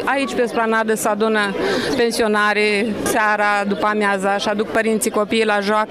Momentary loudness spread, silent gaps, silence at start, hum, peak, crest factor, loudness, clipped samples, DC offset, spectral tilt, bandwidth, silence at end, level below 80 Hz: 3 LU; none; 0 s; none; -4 dBFS; 12 dB; -18 LUFS; under 0.1%; 0.1%; -3.5 dB/octave; 16 kHz; 0 s; -52 dBFS